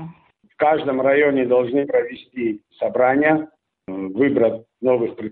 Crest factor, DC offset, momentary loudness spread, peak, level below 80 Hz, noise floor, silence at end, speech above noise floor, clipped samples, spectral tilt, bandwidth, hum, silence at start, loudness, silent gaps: 16 dB; under 0.1%; 12 LU; -2 dBFS; -62 dBFS; -51 dBFS; 0 s; 32 dB; under 0.1%; -5 dB/octave; 4.3 kHz; none; 0 s; -19 LUFS; none